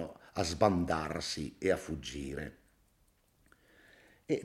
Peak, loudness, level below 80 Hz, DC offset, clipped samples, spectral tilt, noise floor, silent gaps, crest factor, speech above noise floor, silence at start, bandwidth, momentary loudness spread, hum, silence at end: -14 dBFS; -34 LUFS; -56 dBFS; under 0.1%; under 0.1%; -5 dB/octave; -71 dBFS; none; 22 dB; 37 dB; 0 s; 16 kHz; 12 LU; none; 0 s